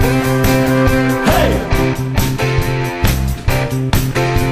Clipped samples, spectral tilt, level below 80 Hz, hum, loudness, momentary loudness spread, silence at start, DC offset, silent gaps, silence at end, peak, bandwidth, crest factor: under 0.1%; -5.5 dB/octave; -22 dBFS; none; -15 LUFS; 4 LU; 0 s; under 0.1%; none; 0 s; 0 dBFS; 15.5 kHz; 14 dB